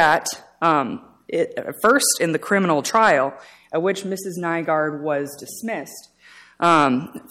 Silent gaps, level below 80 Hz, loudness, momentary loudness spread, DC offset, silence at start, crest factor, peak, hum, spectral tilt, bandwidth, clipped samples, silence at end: none; -64 dBFS; -20 LUFS; 13 LU; under 0.1%; 0 s; 16 dB; -4 dBFS; none; -3.5 dB/octave; 16.5 kHz; under 0.1%; 0.1 s